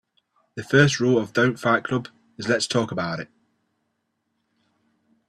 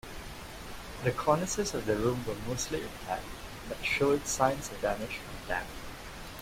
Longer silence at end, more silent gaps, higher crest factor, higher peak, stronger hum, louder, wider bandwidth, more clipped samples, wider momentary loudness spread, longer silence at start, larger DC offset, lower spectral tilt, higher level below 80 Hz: first, 2.05 s vs 0 s; neither; about the same, 22 dB vs 22 dB; first, -4 dBFS vs -10 dBFS; neither; first, -22 LUFS vs -32 LUFS; second, 12.5 kHz vs 16 kHz; neither; first, 20 LU vs 15 LU; first, 0.55 s vs 0.05 s; neither; about the same, -5 dB/octave vs -4 dB/octave; second, -62 dBFS vs -48 dBFS